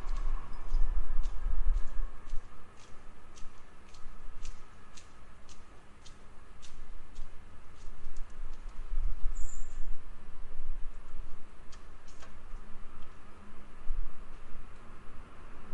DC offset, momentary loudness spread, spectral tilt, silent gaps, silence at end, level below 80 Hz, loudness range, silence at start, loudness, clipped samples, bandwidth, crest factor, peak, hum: under 0.1%; 16 LU; -5 dB/octave; none; 0 s; -36 dBFS; 12 LU; 0 s; -46 LUFS; under 0.1%; 7.6 kHz; 14 dB; -12 dBFS; none